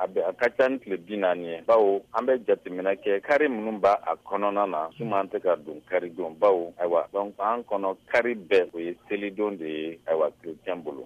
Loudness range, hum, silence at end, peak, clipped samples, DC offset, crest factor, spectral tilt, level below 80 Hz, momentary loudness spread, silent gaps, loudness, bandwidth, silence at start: 3 LU; none; 0 s; -10 dBFS; under 0.1%; under 0.1%; 16 dB; -6.5 dB/octave; -70 dBFS; 9 LU; none; -26 LUFS; 9.6 kHz; 0 s